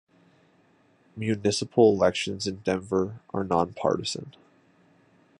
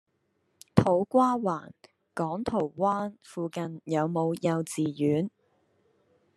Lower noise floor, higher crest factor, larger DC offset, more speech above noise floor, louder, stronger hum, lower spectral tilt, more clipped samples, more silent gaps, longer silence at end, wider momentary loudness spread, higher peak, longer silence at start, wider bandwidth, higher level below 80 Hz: second, -62 dBFS vs -74 dBFS; second, 20 dB vs 26 dB; neither; second, 37 dB vs 46 dB; about the same, -26 LUFS vs -28 LUFS; neither; second, -5 dB/octave vs -7 dB/octave; neither; neither; about the same, 1.1 s vs 1.1 s; about the same, 13 LU vs 12 LU; second, -8 dBFS vs -2 dBFS; first, 1.15 s vs 0.75 s; second, 11.5 kHz vs 13 kHz; first, -56 dBFS vs -62 dBFS